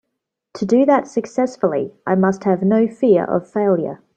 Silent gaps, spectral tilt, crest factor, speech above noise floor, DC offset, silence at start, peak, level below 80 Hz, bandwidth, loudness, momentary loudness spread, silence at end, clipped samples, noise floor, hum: none; -8 dB/octave; 16 dB; 61 dB; under 0.1%; 0.55 s; -2 dBFS; -62 dBFS; 8.6 kHz; -18 LUFS; 7 LU; 0.2 s; under 0.1%; -78 dBFS; none